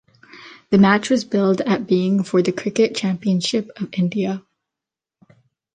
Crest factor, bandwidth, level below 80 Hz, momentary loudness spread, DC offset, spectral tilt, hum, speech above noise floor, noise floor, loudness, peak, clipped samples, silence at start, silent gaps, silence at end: 18 dB; 9.4 kHz; -60 dBFS; 9 LU; under 0.1%; -6 dB/octave; none; 69 dB; -87 dBFS; -19 LUFS; -2 dBFS; under 0.1%; 0.35 s; none; 1.35 s